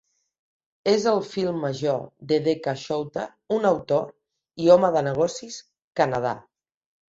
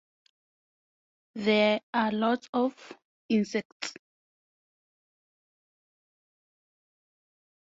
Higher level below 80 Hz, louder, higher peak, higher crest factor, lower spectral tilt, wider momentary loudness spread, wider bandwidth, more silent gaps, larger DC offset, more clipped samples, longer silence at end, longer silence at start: first, -62 dBFS vs -78 dBFS; first, -24 LUFS vs -28 LUFS; first, -4 dBFS vs -12 dBFS; about the same, 20 dB vs 20 dB; about the same, -5.5 dB/octave vs -5 dB/octave; about the same, 16 LU vs 14 LU; about the same, 8 kHz vs 7.8 kHz; second, 5.84-5.91 s vs 1.83-1.93 s, 2.49-2.53 s, 3.05-3.29 s, 3.65-3.80 s; neither; neither; second, 0.7 s vs 3.85 s; second, 0.85 s vs 1.35 s